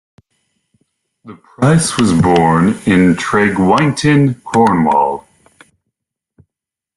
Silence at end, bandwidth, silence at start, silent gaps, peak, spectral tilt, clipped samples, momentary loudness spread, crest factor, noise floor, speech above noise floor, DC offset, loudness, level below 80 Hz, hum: 1.75 s; 12 kHz; 1.25 s; none; 0 dBFS; -6 dB/octave; under 0.1%; 4 LU; 14 dB; -84 dBFS; 73 dB; under 0.1%; -12 LUFS; -46 dBFS; none